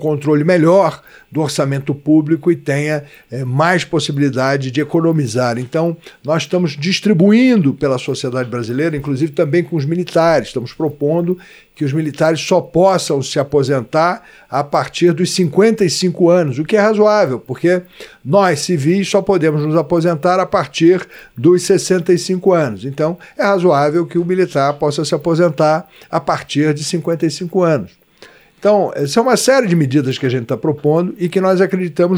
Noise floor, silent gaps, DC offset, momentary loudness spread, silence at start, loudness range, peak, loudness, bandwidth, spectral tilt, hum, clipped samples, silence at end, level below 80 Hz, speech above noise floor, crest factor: -44 dBFS; none; under 0.1%; 8 LU; 0 s; 3 LU; -2 dBFS; -15 LUFS; 15.5 kHz; -6 dB/octave; none; under 0.1%; 0 s; -52 dBFS; 30 dB; 14 dB